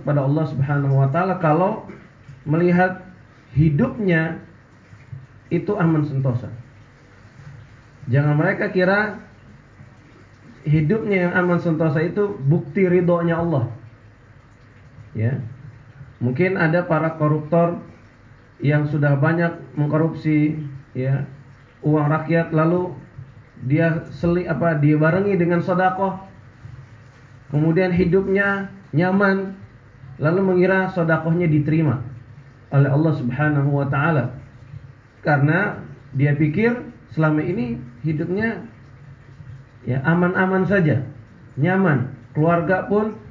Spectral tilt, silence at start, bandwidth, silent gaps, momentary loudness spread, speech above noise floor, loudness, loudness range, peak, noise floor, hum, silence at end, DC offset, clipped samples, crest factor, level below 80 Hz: -10 dB/octave; 0 s; 4.9 kHz; none; 17 LU; 29 dB; -20 LUFS; 4 LU; -6 dBFS; -48 dBFS; none; 0 s; under 0.1%; under 0.1%; 14 dB; -48 dBFS